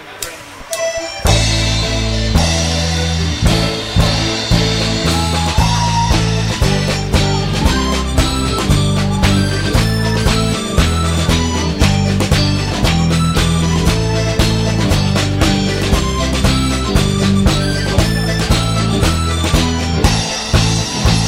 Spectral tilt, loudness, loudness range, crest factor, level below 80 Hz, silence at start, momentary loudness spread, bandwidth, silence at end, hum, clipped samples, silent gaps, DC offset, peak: -4.5 dB/octave; -14 LUFS; 1 LU; 14 dB; -20 dBFS; 0 s; 3 LU; 16 kHz; 0 s; none; under 0.1%; none; under 0.1%; 0 dBFS